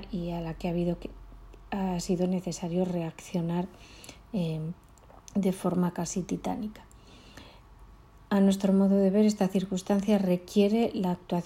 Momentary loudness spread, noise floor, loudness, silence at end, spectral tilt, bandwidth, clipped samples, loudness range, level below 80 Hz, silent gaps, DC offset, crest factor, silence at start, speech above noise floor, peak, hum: 14 LU; -52 dBFS; -29 LUFS; 0 s; -7 dB/octave; 15 kHz; under 0.1%; 8 LU; -52 dBFS; none; under 0.1%; 16 dB; 0 s; 25 dB; -12 dBFS; none